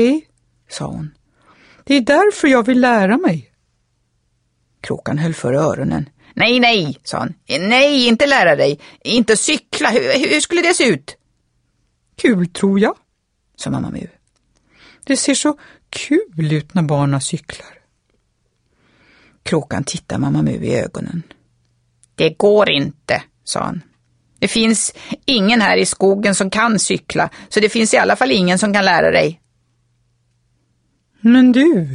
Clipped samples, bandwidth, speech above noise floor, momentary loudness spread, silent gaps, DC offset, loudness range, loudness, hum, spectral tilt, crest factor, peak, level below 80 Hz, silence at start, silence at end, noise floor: under 0.1%; 11 kHz; 52 dB; 15 LU; none; under 0.1%; 8 LU; -15 LUFS; none; -4 dB/octave; 16 dB; -2 dBFS; -50 dBFS; 0 s; 0 s; -67 dBFS